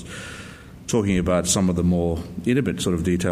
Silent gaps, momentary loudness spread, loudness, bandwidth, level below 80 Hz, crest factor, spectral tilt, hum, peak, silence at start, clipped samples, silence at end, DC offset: none; 17 LU; -22 LUFS; 15.5 kHz; -44 dBFS; 14 dB; -5 dB/octave; none; -8 dBFS; 0 s; under 0.1%; 0 s; under 0.1%